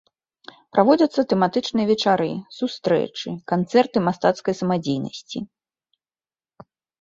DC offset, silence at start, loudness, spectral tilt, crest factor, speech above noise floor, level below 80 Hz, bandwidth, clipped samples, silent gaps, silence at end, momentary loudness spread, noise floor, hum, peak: under 0.1%; 0.75 s; -21 LUFS; -6 dB/octave; 20 dB; over 69 dB; -64 dBFS; 7.8 kHz; under 0.1%; none; 1.55 s; 13 LU; under -90 dBFS; none; -2 dBFS